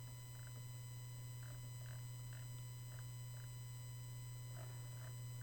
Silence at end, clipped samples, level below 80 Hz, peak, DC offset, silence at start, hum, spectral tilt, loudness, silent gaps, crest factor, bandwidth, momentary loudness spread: 0 s; under 0.1%; -66 dBFS; -40 dBFS; under 0.1%; 0 s; none; -4.5 dB/octave; -52 LUFS; none; 10 dB; over 20 kHz; 1 LU